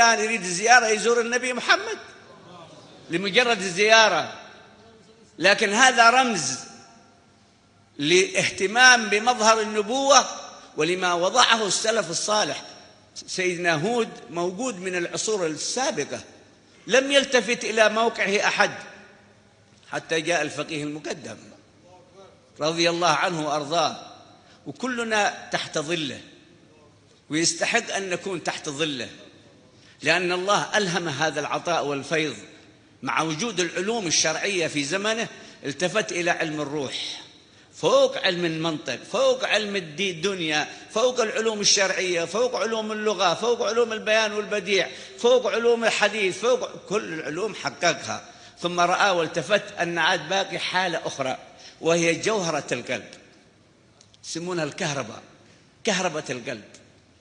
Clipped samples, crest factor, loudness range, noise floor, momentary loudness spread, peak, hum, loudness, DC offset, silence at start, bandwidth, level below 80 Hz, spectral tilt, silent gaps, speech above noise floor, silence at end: under 0.1%; 24 dB; 7 LU; -57 dBFS; 14 LU; 0 dBFS; none; -22 LUFS; under 0.1%; 0 s; 10 kHz; -70 dBFS; -2.5 dB/octave; none; 34 dB; 0.45 s